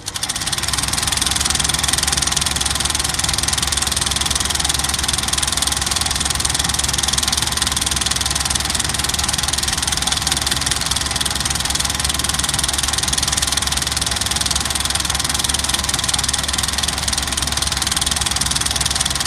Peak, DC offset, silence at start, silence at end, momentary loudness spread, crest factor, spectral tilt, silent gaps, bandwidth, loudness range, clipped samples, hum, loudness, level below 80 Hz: 0 dBFS; under 0.1%; 0 s; 0 s; 2 LU; 20 dB; -1 dB/octave; none; 16 kHz; 1 LU; under 0.1%; none; -17 LUFS; -30 dBFS